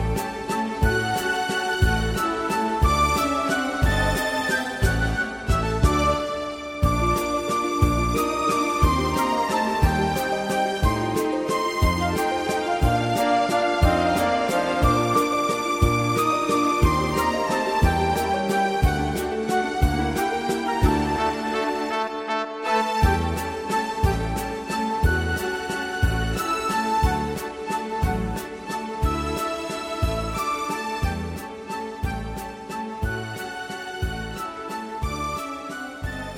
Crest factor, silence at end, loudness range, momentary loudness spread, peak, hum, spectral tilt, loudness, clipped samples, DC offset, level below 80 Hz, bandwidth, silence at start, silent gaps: 18 dB; 0 s; 7 LU; 9 LU; -6 dBFS; none; -5 dB/octave; -24 LUFS; under 0.1%; under 0.1%; -30 dBFS; 17 kHz; 0 s; none